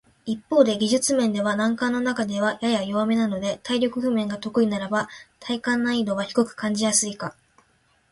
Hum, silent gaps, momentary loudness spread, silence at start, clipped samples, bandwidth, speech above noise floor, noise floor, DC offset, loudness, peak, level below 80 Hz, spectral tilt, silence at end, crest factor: none; none; 8 LU; 0.25 s; under 0.1%; 11.5 kHz; 41 dB; -63 dBFS; under 0.1%; -23 LUFS; -2 dBFS; -62 dBFS; -3.5 dB/octave; 0.8 s; 20 dB